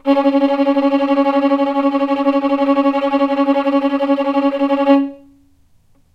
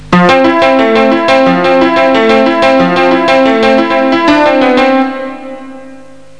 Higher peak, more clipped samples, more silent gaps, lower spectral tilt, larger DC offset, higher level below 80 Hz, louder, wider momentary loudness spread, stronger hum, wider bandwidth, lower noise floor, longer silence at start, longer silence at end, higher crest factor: about the same, -2 dBFS vs 0 dBFS; neither; neither; about the same, -5.5 dB/octave vs -6 dB/octave; second, under 0.1% vs 2%; second, -58 dBFS vs -44 dBFS; second, -15 LUFS vs -7 LUFS; second, 2 LU vs 7 LU; neither; second, 5.6 kHz vs 10 kHz; first, -52 dBFS vs -34 dBFS; about the same, 0.05 s vs 0 s; first, 1 s vs 0.4 s; first, 14 dB vs 8 dB